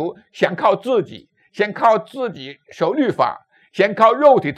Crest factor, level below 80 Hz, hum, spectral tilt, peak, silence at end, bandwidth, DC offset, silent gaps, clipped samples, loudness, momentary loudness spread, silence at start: 18 dB; -68 dBFS; none; -6.5 dB/octave; 0 dBFS; 0.05 s; 9.6 kHz; under 0.1%; none; under 0.1%; -18 LUFS; 20 LU; 0 s